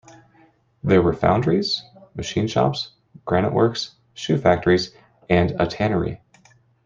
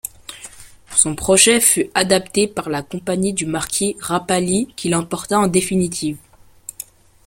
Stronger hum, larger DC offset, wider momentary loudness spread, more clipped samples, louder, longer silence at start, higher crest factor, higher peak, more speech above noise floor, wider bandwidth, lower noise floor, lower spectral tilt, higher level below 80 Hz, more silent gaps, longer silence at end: neither; neither; second, 14 LU vs 22 LU; neither; second, -21 LUFS vs -17 LUFS; first, 0.85 s vs 0.05 s; about the same, 20 dB vs 20 dB; about the same, -2 dBFS vs 0 dBFS; first, 37 dB vs 22 dB; second, 7.6 kHz vs 16.5 kHz; first, -57 dBFS vs -40 dBFS; first, -6.5 dB/octave vs -3 dB/octave; about the same, -48 dBFS vs -48 dBFS; neither; second, 0.7 s vs 1.1 s